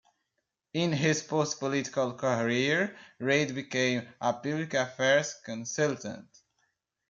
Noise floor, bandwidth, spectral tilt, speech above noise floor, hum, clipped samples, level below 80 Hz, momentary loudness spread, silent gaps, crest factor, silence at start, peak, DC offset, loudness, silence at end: -83 dBFS; 7.8 kHz; -4.5 dB/octave; 53 dB; none; under 0.1%; -74 dBFS; 10 LU; none; 18 dB; 0.75 s; -12 dBFS; under 0.1%; -29 LUFS; 0.9 s